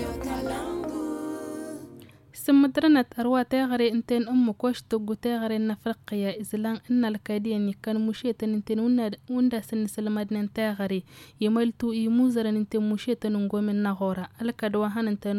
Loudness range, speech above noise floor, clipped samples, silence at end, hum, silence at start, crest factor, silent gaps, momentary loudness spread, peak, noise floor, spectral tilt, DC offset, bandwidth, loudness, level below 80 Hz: 4 LU; 23 dB; under 0.1%; 0 s; none; 0 s; 16 dB; none; 9 LU; -10 dBFS; -48 dBFS; -6.5 dB/octave; under 0.1%; 16 kHz; -27 LUFS; -56 dBFS